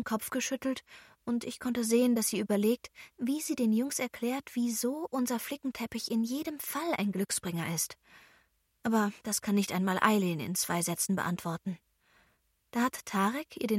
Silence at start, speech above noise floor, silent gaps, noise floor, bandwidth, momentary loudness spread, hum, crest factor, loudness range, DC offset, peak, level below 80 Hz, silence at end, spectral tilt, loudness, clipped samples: 0 s; 41 dB; none; -72 dBFS; 16.5 kHz; 9 LU; none; 24 dB; 3 LU; under 0.1%; -8 dBFS; -70 dBFS; 0 s; -4 dB/octave; -32 LUFS; under 0.1%